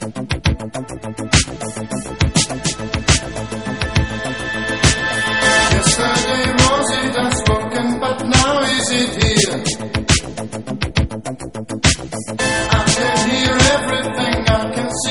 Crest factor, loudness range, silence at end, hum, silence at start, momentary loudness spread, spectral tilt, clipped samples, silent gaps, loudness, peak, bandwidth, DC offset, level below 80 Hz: 18 dB; 4 LU; 0 s; none; 0 s; 12 LU; -3.5 dB/octave; under 0.1%; none; -16 LUFS; 0 dBFS; 11.5 kHz; 0.7%; -28 dBFS